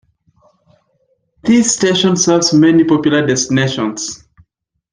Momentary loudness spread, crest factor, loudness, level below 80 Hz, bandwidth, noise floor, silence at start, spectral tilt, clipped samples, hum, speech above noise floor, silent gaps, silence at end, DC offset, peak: 12 LU; 14 dB; -12 LUFS; -52 dBFS; 10.5 kHz; -65 dBFS; 1.45 s; -4 dB/octave; under 0.1%; none; 52 dB; none; 0.75 s; under 0.1%; -2 dBFS